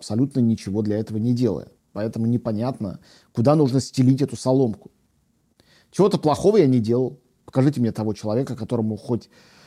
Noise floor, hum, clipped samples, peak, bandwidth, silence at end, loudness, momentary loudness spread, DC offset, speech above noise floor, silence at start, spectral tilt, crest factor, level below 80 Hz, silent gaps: -65 dBFS; none; under 0.1%; -4 dBFS; 13.5 kHz; 0.45 s; -22 LUFS; 12 LU; under 0.1%; 44 dB; 0 s; -8 dB/octave; 18 dB; -58 dBFS; none